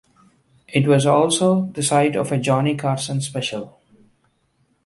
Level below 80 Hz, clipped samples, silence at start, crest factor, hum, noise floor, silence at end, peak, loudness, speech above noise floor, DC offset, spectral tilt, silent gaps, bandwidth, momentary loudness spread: -60 dBFS; under 0.1%; 0.7 s; 18 dB; none; -65 dBFS; 1.15 s; -4 dBFS; -19 LUFS; 46 dB; under 0.1%; -5 dB/octave; none; 11.5 kHz; 10 LU